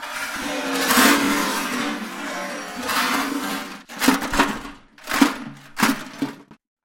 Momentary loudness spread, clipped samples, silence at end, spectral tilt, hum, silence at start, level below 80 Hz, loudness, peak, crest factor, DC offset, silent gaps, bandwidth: 15 LU; under 0.1%; 0.3 s; -2.5 dB/octave; none; 0 s; -46 dBFS; -21 LUFS; 0 dBFS; 22 dB; under 0.1%; none; 16.5 kHz